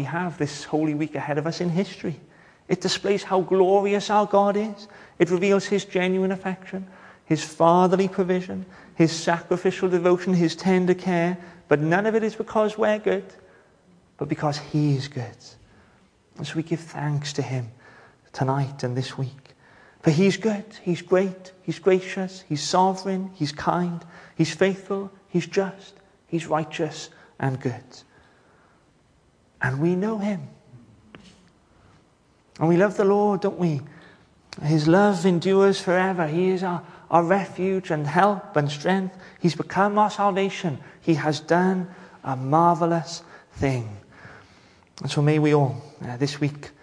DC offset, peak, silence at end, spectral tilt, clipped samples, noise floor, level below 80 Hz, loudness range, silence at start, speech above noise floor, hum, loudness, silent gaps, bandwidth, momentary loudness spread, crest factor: under 0.1%; -2 dBFS; 0.15 s; -6.5 dB/octave; under 0.1%; -60 dBFS; -62 dBFS; 8 LU; 0 s; 37 dB; none; -23 LUFS; none; 10.5 kHz; 14 LU; 20 dB